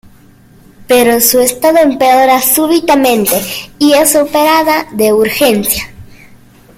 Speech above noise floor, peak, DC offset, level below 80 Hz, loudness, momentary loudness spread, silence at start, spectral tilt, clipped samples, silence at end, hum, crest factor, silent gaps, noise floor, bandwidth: 32 dB; 0 dBFS; under 0.1%; -42 dBFS; -9 LUFS; 6 LU; 0.8 s; -2.5 dB/octave; under 0.1%; 0.7 s; none; 10 dB; none; -41 dBFS; over 20 kHz